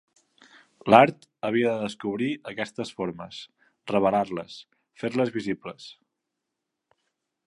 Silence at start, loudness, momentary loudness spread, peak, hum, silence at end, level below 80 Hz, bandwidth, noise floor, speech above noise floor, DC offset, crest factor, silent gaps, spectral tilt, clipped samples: 0.85 s; -25 LUFS; 23 LU; -2 dBFS; none; 1.55 s; -66 dBFS; 11 kHz; -84 dBFS; 59 dB; under 0.1%; 26 dB; none; -6 dB/octave; under 0.1%